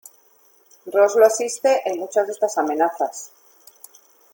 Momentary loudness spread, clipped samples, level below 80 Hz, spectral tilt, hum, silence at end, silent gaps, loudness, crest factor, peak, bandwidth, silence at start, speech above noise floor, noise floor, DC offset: 14 LU; under 0.1%; -74 dBFS; -2 dB/octave; none; 1.05 s; none; -20 LUFS; 20 dB; -2 dBFS; 17 kHz; 0.85 s; 37 dB; -56 dBFS; under 0.1%